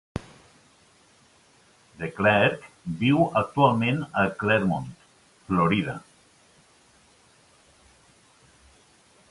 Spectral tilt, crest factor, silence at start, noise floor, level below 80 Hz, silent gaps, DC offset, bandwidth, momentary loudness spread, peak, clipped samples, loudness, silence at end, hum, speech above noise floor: -7 dB/octave; 22 dB; 0.15 s; -59 dBFS; -54 dBFS; none; under 0.1%; 11.5 kHz; 16 LU; -6 dBFS; under 0.1%; -24 LUFS; 3.3 s; none; 36 dB